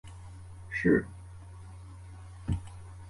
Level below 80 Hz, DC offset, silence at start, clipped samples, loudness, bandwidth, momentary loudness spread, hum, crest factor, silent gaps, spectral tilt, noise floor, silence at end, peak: -48 dBFS; under 0.1%; 0.05 s; under 0.1%; -31 LUFS; 11.5 kHz; 22 LU; none; 22 dB; none; -8 dB/octave; -47 dBFS; 0 s; -12 dBFS